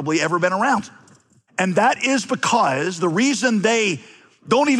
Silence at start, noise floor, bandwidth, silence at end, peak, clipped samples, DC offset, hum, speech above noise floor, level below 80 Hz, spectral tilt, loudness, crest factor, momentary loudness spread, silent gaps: 0 s; -54 dBFS; 12 kHz; 0 s; -6 dBFS; under 0.1%; under 0.1%; none; 35 dB; -72 dBFS; -4 dB/octave; -19 LUFS; 14 dB; 6 LU; none